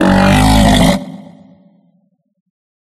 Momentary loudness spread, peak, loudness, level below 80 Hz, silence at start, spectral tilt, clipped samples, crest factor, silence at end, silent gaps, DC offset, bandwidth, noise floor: 11 LU; 0 dBFS; -10 LUFS; -22 dBFS; 0 s; -5.5 dB/octave; under 0.1%; 14 dB; 1.75 s; none; under 0.1%; 13.5 kHz; -59 dBFS